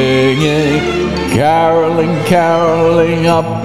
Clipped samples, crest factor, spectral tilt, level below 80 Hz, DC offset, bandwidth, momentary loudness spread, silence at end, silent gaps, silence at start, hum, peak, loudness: under 0.1%; 12 dB; -6 dB/octave; -38 dBFS; 1%; 14 kHz; 4 LU; 0 s; none; 0 s; none; 0 dBFS; -11 LUFS